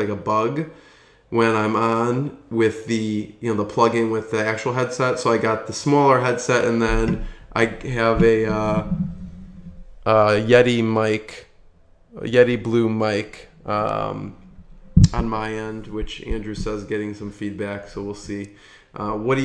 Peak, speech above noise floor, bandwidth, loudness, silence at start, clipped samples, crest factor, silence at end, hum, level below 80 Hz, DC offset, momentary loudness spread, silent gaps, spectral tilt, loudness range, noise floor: 0 dBFS; 30 dB; 10 kHz; -21 LUFS; 0 s; under 0.1%; 20 dB; 0 s; none; -36 dBFS; under 0.1%; 15 LU; none; -6 dB/octave; 5 LU; -51 dBFS